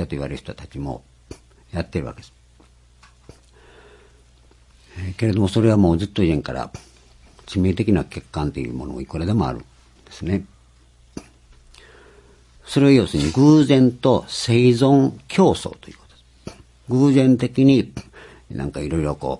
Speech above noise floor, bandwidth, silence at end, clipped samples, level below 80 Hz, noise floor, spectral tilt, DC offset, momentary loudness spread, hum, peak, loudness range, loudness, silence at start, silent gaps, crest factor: 34 dB; 11.5 kHz; 0.05 s; under 0.1%; -44 dBFS; -52 dBFS; -7 dB/octave; under 0.1%; 20 LU; none; -2 dBFS; 17 LU; -19 LUFS; 0 s; none; 18 dB